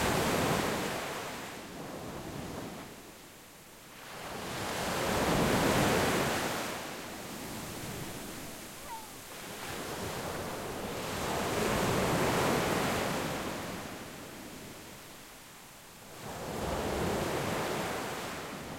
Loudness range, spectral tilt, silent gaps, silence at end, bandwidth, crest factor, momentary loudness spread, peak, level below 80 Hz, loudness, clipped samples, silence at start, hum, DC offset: 11 LU; -4 dB/octave; none; 0 s; 16.5 kHz; 18 dB; 19 LU; -16 dBFS; -52 dBFS; -34 LUFS; under 0.1%; 0 s; none; under 0.1%